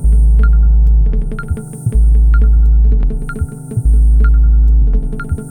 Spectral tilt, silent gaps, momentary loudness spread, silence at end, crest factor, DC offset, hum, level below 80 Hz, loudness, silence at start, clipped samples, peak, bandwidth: -9 dB/octave; none; 10 LU; 0 s; 8 dB; under 0.1%; none; -10 dBFS; -13 LUFS; 0 s; under 0.1%; -2 dBFS; 9.6 kHz